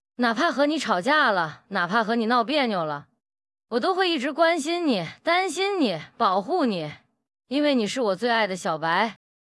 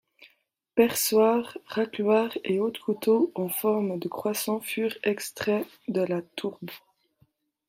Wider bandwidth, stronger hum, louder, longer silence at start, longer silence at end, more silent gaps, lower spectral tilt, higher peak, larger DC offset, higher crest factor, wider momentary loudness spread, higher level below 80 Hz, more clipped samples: second, 12 kHz vs 16 kHz; neither; first, -24 LUFS vs -27 LUFS; about the same, 0.2 s vs 0.2 s; second, 0.4 s vs 0.9 s; neither; about the same, -4 dB/octave vs -4.5 dB/octave; about the same, -8 dBFS vs -8 dBFS; neither; about the same, 16 dB vs 20 dB; second, 7 LU vs 10 LU; about the same, -76 dBFS vs -72 dBFS; neither